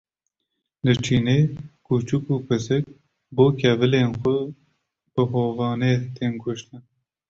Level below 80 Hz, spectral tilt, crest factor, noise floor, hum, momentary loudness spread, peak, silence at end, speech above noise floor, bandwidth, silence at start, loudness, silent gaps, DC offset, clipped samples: -54 dBFS; -7 dB/octave; 18 dB; -79 dBFS; none; 12 LU; -4 dBFS; 0.5 s; 58 dB; 7.8 kHz; 0.85 s; -22 LUFS; none; under 0.1%; under 0.1%